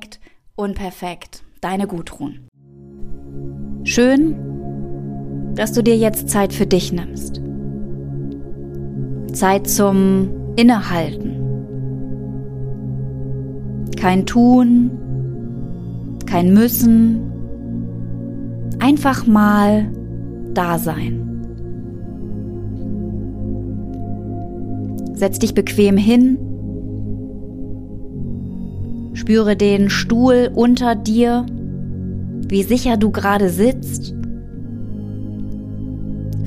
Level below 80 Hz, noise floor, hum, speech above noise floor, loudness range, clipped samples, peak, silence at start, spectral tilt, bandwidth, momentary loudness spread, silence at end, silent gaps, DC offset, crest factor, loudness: -34 dBFS; -42 dBFS; none; 28 dB; 9 LU; under 0.1%; -2 dBFS; 0 s; -6 dB/octave; 15.5 kHz; 16 LU; 0 s; 2.48-2.52 s; under 0.1%; 16 dB; -18 LUFS